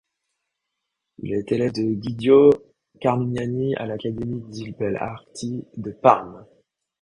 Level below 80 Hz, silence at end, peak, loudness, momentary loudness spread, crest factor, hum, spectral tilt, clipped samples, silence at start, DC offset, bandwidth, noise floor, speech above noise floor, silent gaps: -56 dBFS; 0.6 s; 0 dBFS; -22 LUFS; 16 LU; 22 dB; none; -7.5 dB/octave; under 0.1%; 1.25 s; under 0.1%; 10.5 kHz; -81 dBFS; 59 dB; none